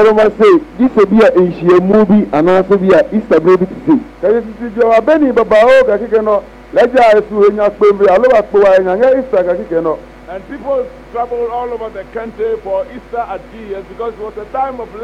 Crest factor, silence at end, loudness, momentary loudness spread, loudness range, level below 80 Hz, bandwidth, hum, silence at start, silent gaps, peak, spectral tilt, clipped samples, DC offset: 8 dB; 0 s; -11 LUFS; 15 LU; 10 LU; -40 dBFS; 9.4 kHz; none; 0 s; none; -4 dBFS; -7.5 dB/octave; under 0.1%; under 0.1%